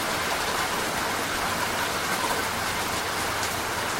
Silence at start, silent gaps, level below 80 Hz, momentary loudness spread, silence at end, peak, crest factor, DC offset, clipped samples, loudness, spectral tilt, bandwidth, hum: 0 s; none; -48 dBFS; 1 LU; 0 s; -14 dBFS; 14 dB; under 0.1%; under 0.1%; -26 LUFS; -2 dB/octave; 16 kHz; none